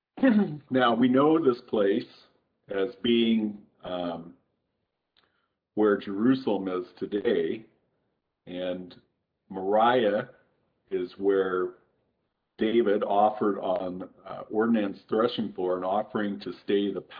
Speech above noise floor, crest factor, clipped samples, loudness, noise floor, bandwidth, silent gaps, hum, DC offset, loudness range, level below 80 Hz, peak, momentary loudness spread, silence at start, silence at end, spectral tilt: 54 dB; 16 dB; under 0.1%; -27 LUFS; -80 dBFS; 5.2 kHz; none; none; under 0.1%; 5 LU; -70 dBFS; -10 dBFS; 15 LU; 0.15 s; 0 s; -9 dB/octave